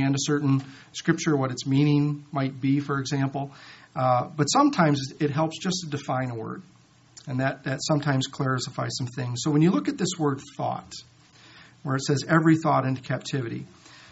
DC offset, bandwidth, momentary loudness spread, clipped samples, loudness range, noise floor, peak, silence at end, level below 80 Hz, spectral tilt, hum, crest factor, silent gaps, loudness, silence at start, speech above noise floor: under 0.1%; 8 kHz; 14 LU; under 0.1%; 4 LU; -52 dBFS; -6 dBFS; 0.15 s; -64 dBFS; -5.5 dB/octave; none; 20 dB; none; -25 LUFS; 0 s; 27 dB